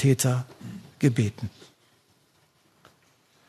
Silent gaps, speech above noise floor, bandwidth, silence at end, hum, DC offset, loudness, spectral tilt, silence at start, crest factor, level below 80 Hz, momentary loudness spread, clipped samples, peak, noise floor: none; 40 dB; 13.5 kHz; 2 s; none; under 0.1%; -26 LUFS; -6 dB/octave; 0 s; 20 dB; -64 dBFS; 18 LU; under 0.1%; -8 dBFS; -64 dBFS